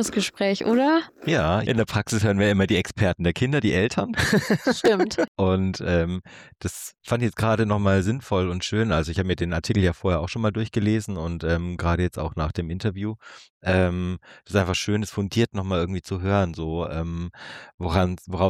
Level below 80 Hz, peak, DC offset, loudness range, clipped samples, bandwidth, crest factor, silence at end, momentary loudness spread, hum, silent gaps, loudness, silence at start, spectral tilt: -42 dBFS; -8 dBFS; under 0.1%; 4 LU; under 0.1%; 15 kHz; 16 dB; 0 s; 10 LU; none; 5.28-5.35 s, 13.50-13.61 s, 17.74-17.78 s; -24 LUFS; 0 s; -6 dB/octave